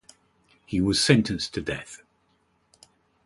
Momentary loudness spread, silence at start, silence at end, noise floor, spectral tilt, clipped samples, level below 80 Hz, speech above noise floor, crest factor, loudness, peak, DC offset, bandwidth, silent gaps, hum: 20 LU; 0.7 s; 1.3 s; -68 dBFS; -4.5 dB/octave; under 0.1%; -50 dBFS; 44 dB; 22 dB; -24 LUFS; -6 dBFS; under 0.1%; 11.5 kHz; none; 50 Hz at -50 dBFS